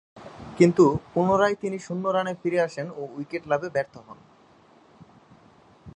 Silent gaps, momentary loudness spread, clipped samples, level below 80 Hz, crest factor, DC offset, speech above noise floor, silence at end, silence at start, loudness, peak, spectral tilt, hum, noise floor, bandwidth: none; 16 LU; under 0.1%; -58 dBFS; 22 dB; under 0.1%; 32 dB; 0.05 s; 0.15 s; -24 LUFS; -4 dBFS; -7 dB/octave; none; -56 dBFS; 9.6 kHz